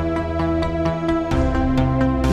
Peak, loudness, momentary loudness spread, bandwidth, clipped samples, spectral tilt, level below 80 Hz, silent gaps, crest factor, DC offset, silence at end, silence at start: -4 dBFS; -20 LUFS; 3 LU; 11.5 kHz; under 0.1%; -8 dB/octave; -26 dBFS; none; 14 dB; under 0.1%; 0 s; 0 s